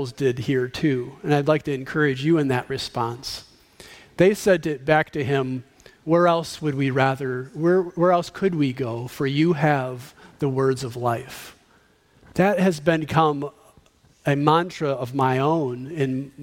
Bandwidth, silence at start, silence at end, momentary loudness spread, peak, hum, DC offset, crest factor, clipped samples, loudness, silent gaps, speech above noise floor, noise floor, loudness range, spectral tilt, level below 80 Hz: 16.5 kHz; 0 s; 0 s; 11 LU; -2 dBFS; none; under 0.1%; 22 dB; under 0.1%; -22 LUFS; none; 36 dB; -58 dBFS; 3 LU; -6.5 dB/octave; -56 dBFS